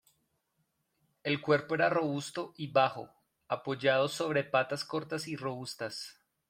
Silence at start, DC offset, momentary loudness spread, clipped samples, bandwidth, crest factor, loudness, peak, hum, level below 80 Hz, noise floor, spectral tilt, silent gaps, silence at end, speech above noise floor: 1.25 s; under 0.1%; 11 LU; under 0.1%; 16.5 kHz; 20 dB; -32 LUFS; -14 dBFS; none; -76 dBFS; -79 dBFS; -5 dB/octave; none; 0.4 s; 47 dB